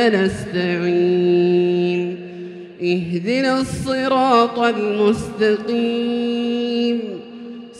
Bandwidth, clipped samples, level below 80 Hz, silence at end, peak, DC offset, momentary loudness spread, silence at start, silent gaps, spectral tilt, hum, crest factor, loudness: 11.5 kHz; under 0.1%; -50 dBFS; 0 s; -2 dBFS; under 0.1%; 14 LU; 0 s; none; -6 dB/octave; none; 18 dB; -18 LUFS